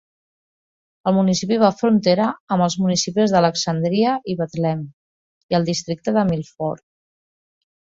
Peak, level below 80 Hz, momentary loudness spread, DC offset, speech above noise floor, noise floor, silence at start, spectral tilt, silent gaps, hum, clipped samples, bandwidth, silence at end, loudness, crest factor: -2 dBFS; -58 dBFS; 10 LU; under 0.1%; over 71 dB; under -90 dBFS; 1.05 s; -5.5 dB/octave; 2.40-2.47 s, 4.94-5.49 s; none; under 0.1%; 7.8 kHz; 1.05 s; -19 LUFS; 18 dB